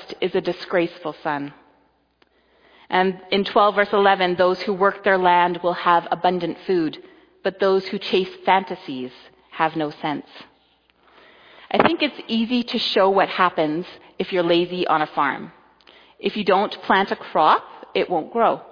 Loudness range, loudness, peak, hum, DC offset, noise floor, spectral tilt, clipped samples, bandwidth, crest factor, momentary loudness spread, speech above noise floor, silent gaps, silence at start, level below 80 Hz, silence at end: 6 LU; -21 LUFS; 0 dBFS; none; under 0.1%; -62 dBFS; -6.5 dB/octave; under 0.1%; 5.2 kHz; 20 dB; 11 LU; 41 dB; none; 0 s; -64 dBFS; 0.05 s